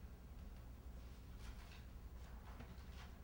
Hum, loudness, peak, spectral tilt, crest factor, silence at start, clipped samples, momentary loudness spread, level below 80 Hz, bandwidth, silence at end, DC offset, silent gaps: none; -58 LUFS; -42 dBFS; -5.5 dB/octave; 12 dB; 0 s; under 0.1%; 2 LU; -56 dBFS; over 20 kHz; 0 s; under 0.1%; none